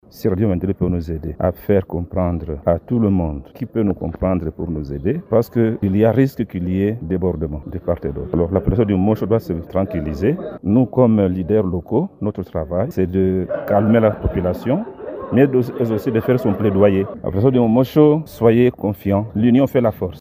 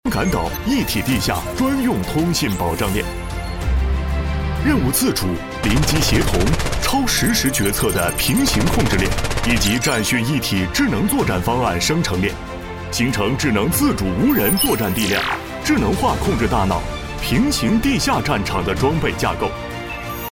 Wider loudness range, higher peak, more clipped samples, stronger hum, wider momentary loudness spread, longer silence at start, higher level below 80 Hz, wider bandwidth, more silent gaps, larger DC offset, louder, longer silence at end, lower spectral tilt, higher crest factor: about the same, 4 LU vs 3 LU; about the same, 0 dBFS vs -2 dBFS; neither; neither; about the same, 9 LU vs 7 LU; about the same, 0.15 s vs 0.05 s; second, -36 dBFS vs -28 dBFS; about the same, 16 kHz vs 17 kHz; neither; neither; about the same, -18 LUFS vs -18 LUFS; about the same, 0 s vs 0.05 s; first, -9.5 dB/octave vs -4.5 dB/octave; about the same, 16 dB vs 16 dB